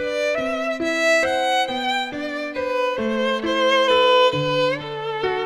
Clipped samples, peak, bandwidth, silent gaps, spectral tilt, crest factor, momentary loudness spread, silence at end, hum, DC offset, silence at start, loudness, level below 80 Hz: under 0.1%; -6 dBFS; 13.5 kHz; none; -3.5 dB/octave; 14 dB; 10 LU; 0 s; none; under 0.1%; 0 s; -20 LUFS; -54 dBFS